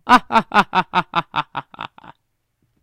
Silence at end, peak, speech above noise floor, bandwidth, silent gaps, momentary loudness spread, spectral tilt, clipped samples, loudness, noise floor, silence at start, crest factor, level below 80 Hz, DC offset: 0.95 s; 0 dBFS; 53 dB; 16.5 kHz; none; 20 LU; -4.5 dB/octave; under 0.1%; -18 LUFS; -69 dBFS; 0.05 s; 20 dB; -48 dBFS; under 0.1%